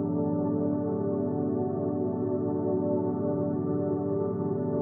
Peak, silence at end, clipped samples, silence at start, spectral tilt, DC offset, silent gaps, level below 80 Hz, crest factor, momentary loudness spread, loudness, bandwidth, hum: -16 dBFS; 0 s; under 0.1%; 0 s; -14.5 dB/octave; under 0.1%; none; -74 dBFS; 12 dB; 2 LU; -29 LUFS; 2 kHz; none